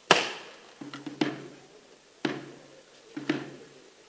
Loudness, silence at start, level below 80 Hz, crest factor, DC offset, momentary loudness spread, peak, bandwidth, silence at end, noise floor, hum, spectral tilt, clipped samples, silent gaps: -32 LUFS; 0.1 s; -80 dBFS; 32 dB; under 0.1%; 22 LU; -2 dBFS; 8 kHz; 0.2 s; -56 dBFS; none; -3 dB/octave; under 0.1%; none